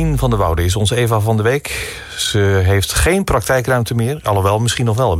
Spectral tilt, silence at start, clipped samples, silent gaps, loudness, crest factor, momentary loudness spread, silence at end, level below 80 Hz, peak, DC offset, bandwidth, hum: -5 dB/octave; 0 s; under 0.1%; none; -16 LUFS; 12 dB; 5 LU; 0 s; -28 dBFS; -4 dBFS; under 0.1%; 16.5 kHz; none